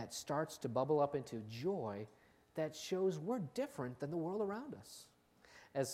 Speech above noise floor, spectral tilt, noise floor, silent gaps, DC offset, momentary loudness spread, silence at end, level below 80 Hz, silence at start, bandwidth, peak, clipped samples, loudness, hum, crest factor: 25 dB; -5.5 dB/octave; -66 dBFS; none; under 0.1%; 14 LU; 0 s; -78 dBFS; 0 s; 16 kHz; -22 dBFS; under 0.1%; -41 LUFS; none; 18 dB